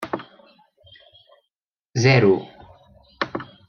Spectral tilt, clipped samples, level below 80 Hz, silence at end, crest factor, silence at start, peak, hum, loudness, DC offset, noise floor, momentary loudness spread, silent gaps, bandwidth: -6 dB/octave; under 0.1%; -60 dBFS; 0.25 s; 22 dB; 0 s; -2 dBFS; none; -20 LUFS; under 0.1%; -84 dBFS; 17 LU; 1.62-1.71 s, 1.79-1.84 s; 7 kHz